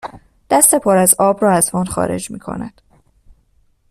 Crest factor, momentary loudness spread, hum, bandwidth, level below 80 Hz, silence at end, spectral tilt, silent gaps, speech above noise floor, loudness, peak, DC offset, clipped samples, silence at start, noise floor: 16 dB; 17 LU; none; 16 kHz; -46 dBFS; 1.2 s; -4 dB/octave; none; 42 dB; -13 LUFS; 0 dBFS; under 0.1%; under 0.1%; 0.05 s; -57 dBFS